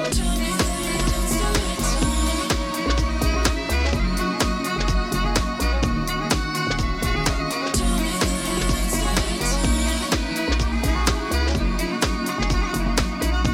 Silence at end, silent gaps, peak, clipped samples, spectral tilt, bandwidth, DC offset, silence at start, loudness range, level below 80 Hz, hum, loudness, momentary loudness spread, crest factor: 0 s; none; -6 dBFS; under 0.1%; -4 dB/octave; 17 kHz; under 0.1%; 0 s; 1 LU; -24 dBFS; none; -22 LUFS; 2 LU; 16 dB